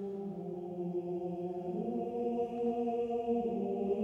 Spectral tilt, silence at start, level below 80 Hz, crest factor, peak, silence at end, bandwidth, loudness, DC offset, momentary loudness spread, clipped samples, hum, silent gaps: -9.5 dB/octave; 0 s; -68 dBFS; 12 dB; -22 dBFS; 0 s; 7.2 kHz; -36 LUFS; under 0.1%; 7 LU; under 0.1%; none; none